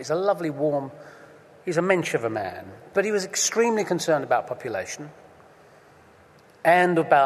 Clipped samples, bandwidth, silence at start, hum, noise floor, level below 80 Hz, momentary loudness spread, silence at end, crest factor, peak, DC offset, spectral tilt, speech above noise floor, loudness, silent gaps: under 0.1%; 13.5 kHz; 0 s; none; -53 dBFS; -70 dBFS; 17 LU; 0 s; 20 dB; -4 dBFS; under 0.1%; -4 dB/octave; 30 dB; -24 LUFS; none